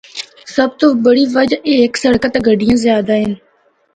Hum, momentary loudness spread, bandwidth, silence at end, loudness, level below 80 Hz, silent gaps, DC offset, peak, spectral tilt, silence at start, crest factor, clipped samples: none; 10 LU; 9.4 kHz; 0.6 s; -13 LUFS; -44 dBFS; none; under 0.1%; 0 dBFS; -5 dB/octave; 0.15 s; 14 dB; under 0.1%